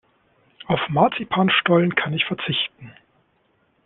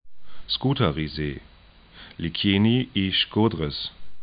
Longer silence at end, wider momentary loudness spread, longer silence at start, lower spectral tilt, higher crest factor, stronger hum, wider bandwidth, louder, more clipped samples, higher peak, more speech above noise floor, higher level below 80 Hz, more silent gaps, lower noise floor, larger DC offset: first, 0.95 s vs 0 s; second, 7 LU vs 12 LU; first, 0.7 s vs 0.05 s; about the same, -9.5 dB/octave vs -10.5 dB/octave; about the same, 20 dB vs 18 dB; neither; second, 4.1 kHz vs 5.2 kHz; first, -20 LUFS vs -24 LUFS; neither; first, -2 dBFS vs -8 dBFS; first, 44 dB vs 26 dB; second, -58 dBFS vs -46 dBFS; neither; first, -65 dBFS vs -50 dBFS; neither